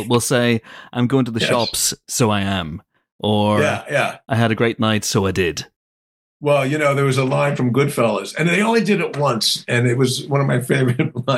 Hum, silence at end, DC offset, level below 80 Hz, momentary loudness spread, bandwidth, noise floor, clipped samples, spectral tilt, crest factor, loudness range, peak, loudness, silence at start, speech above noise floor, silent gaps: none; 0 s; under 0.1%; -52 dBFS; 6 LU; 16 kHz; under -90 dBFS; under 0.1%; -4.5 dB/octave; 14 dB; 2 LU; -4 dBFS; -18 LUFS; 0 s; over 72 dB; 3.12-3.19 s, 5.76-6.40 s